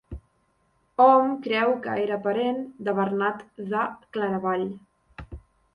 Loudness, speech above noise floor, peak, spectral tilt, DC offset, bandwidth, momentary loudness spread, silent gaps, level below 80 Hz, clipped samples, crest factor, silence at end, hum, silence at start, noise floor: -24 LUFS; 44 dB; -6 dBFS; -8 dB/octave; under 0.1%; 5.4 kHz; 25 LU; none; -52 dBFS; under 0.1%; 20 dB; 0.35 s; none; 0.1 s; -68 dBFS